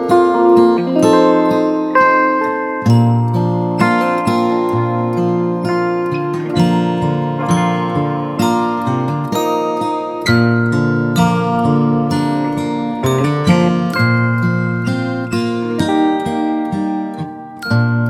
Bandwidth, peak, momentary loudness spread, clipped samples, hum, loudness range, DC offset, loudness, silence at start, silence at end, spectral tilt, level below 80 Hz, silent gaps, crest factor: 14 kHz; 0 dBFS; 7 LU; under 0.1%; none; 4 LU; under 0.1%; -15 LUFS; 0 s; 0 s; -7 dB/octave; -50 dBFS; none; 14 dB